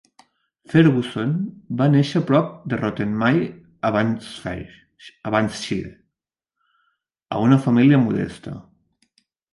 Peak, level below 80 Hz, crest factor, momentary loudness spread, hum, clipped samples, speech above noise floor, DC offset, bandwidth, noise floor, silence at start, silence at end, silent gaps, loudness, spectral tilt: -2 dBFS; -54 dBFS; 20 dB; 16 LU; none; under 0.1%; 65 dB; under 0.1%; 11.5 kHz; -84 dBFS; 0.7 s; 0.9 s; none; -20 LUFS; -7.5 dB/octave